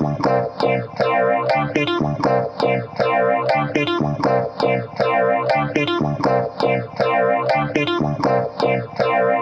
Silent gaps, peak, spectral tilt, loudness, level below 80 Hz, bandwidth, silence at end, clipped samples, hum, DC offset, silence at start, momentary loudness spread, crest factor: none; -6 dBFS; -7 dB/octave; -19 LUFS; -50 dBFS; 8.2 kHz; 0 s; under 0.1%; none; under 0.1%; 0 s; 3 LU; 14 dB